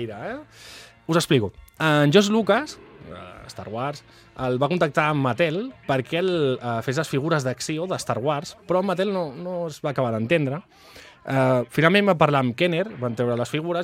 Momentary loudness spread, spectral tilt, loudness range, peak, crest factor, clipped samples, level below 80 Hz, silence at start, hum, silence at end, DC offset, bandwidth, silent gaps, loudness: 19 LU; -5.5 dB/octave; 4 LU; -2 dBFS; 20 dB; under 0.1%; -58 dBFS; 0 s; none; 0 s; under 0.1%; 16 kHz; none; -23 LUFS